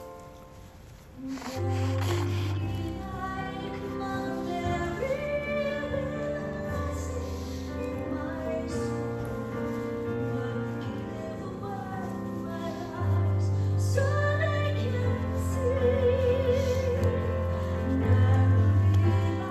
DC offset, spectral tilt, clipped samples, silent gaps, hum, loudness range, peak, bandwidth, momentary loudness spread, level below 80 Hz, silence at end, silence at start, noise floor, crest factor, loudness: under 0.1%; -7.5 dB/octave; under 0.1%; none; none; 8 LU; -12 dBFS; 13 kHz; 11 LU; -44 dBFS; 0 s; 0 s; -48 dBFS; 16 dB; -29 LUFS